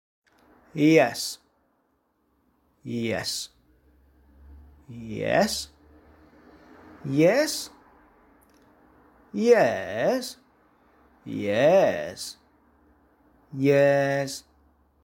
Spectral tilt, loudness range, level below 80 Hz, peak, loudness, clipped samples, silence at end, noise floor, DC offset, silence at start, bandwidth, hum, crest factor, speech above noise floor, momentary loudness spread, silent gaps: -5 dB/octave; 10 LU; -60 dBFS; -6 dBFS; -24 LUFS; under 0.1%; 0.65 s; -70 dBFS; under 0.1%; 0.75 s; 17 kHz; none; 22 dB; 47 dB; 20 LU; none